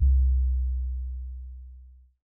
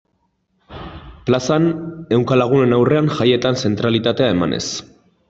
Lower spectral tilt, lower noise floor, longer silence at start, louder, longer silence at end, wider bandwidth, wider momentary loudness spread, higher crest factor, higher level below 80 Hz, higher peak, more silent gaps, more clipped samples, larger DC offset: first, -13.5 dB/octave vs -6 dB/octave; second, -50 dBFS vs -66 dBFS; second, 0 s vs 0.7 s; second, -28 LUFS vs -17 LUFS; about the same, 0.35 s vs 0.45 s; second, 0.3 kHz vs 8 kHz; first, 21 LU vs 14 LU; about the same, 12 dB vs 16 dB; first, -26 dBFS vs -48 dBFS; second, -14 dBFS vs -2 dBFS; neither; neither; neither